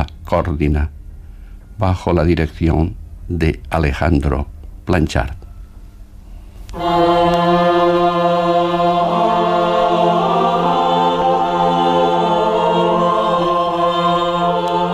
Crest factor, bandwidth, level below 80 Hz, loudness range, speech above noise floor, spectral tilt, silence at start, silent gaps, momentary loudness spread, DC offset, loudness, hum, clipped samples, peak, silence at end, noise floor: 14 dB; 13.5 kHz; -28 dBFS; 6 LU; 20 dB; -7 dB/octave; 0 s; none; 7 LU; under 0.1%; -16 LUFS; none; under 0.1%; -2 dBFS; 0 s; -36 dBFS